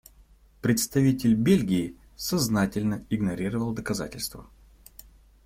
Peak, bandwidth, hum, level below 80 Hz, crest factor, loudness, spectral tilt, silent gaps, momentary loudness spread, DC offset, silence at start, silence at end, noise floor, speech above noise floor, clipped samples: -10 dBFS; 16.5 kHz; none; -50 dBFS; 18 dB; -26 LUFS; -5.5 dB/octave; none; 11 LU; under 0.1%; 0.65 s; 1.05 s; -56 dBFS; 31 dB; under 0.1%